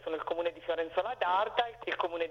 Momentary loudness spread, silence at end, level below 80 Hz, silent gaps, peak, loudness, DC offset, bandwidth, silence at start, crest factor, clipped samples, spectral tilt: 6 LU; 0 s; -66 dBFS; none; -14 dBFS; -33 LUFS; under 0.1%; 6.8 kHz; 0 s; 20 dB; under 0.1%; -4.5 dB/octave